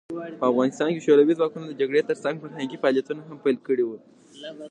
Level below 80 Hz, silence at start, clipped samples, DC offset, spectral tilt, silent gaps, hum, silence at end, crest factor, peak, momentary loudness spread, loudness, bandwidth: -78 dBFS; 0.1 s; under 0.1%; under 0.1%; -6 dB/octave; none; none; 0 s; 18 dB; -6 dBFS; 17 LU; -24 LUFS; 9.4 kHz